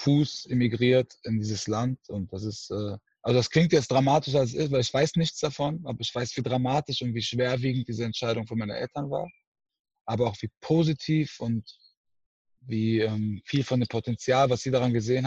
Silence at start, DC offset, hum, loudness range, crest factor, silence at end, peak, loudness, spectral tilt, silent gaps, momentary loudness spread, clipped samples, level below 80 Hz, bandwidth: 0 s; under 0.1%; none; 5 LU; 18 dB; 0 s; -8 dBFS; -27 LUFS; -6 dB/octave; 9.47-9.52 s, 9.79-9.85 s, 10.01-10.05 s, 10.57-10.61 s, 11.97-12.04 s, 12.26-12.45 s; 11 LU; under 0.1%; -60 dBFS; 8.2 kHz